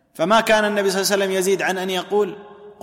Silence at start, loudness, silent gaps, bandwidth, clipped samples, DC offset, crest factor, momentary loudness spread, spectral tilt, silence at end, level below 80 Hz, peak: 0.2 s; -19 LUFS; none; 16.5 kHz; under 0.1%; under 0.1%; 14 dB; 7 LU; -3.5 dB/octave; 0.1 s; -58 dBFS; -6 dBFS